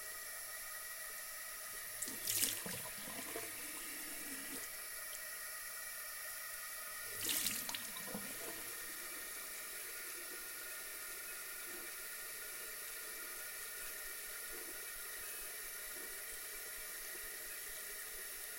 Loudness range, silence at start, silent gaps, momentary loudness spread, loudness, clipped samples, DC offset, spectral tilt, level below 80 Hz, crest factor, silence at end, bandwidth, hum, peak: 4 LU; 0 s; none; 7 LU; -43 LUFS; under 0.1%; under 0.1%; 0 dB/octave; -70 dBFS; 32 dB; 0 s; 16.5 kHz; none; -14 dBFS